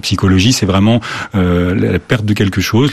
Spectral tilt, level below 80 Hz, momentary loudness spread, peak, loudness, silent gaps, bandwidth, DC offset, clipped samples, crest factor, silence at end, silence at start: -5.5 dB/octave; -40 dBFS; 5 LU; 0 dBFS; -13 LUFS; none; 14 kHz; under 0.1%; under 0.1%; 12 dB; 0 s; 0.05 s